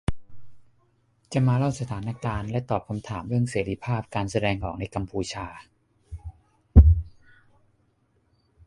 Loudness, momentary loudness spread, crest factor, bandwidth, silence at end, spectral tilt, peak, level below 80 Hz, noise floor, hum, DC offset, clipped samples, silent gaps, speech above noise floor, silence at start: -25 LUFS; 23 LU; 24 dB; 11 kHz; 1.6 s; -7 dB/octave; -2 dBFS; -28 dBFS; -67 dBFS; none; under 0.1%; under 0.1%; none; 40 dB; 0.1 s